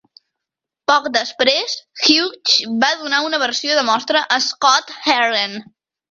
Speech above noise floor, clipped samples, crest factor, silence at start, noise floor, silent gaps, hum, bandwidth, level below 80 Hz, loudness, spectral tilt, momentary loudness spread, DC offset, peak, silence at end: 67 dB; under 0.1%; 18 dB; 0.9 s; -84 dBFS; none; none; 7.8 kHz; -66 dBFS; -16 LUFS; -1 dB/octave; 6 LU; under 0.1%; 0 dBFS; 0.5 s